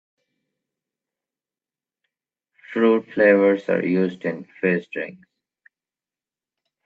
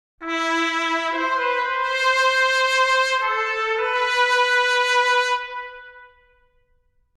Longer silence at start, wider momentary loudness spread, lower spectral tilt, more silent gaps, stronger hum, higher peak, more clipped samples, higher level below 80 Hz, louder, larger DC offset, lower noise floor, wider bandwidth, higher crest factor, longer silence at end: first, 2.7 s vs 0.2 s; first, 15 LU vs 6 LU; first, -8.5 dB/octave vs 0.5 dB/octave; neither; neither; first, -4 dBFS vs -8 dBFS; neither; second, -72 dBFS vs -60 dBFS; about the same, -21 LUFS vs -19 LUFS; neither; first, under -90 dBFS vs -63 dBFS; second, 4.9 kHz vs 14 kHz; first, 20 dB vs 14 dB; first, 1.75 s vs 1.1 s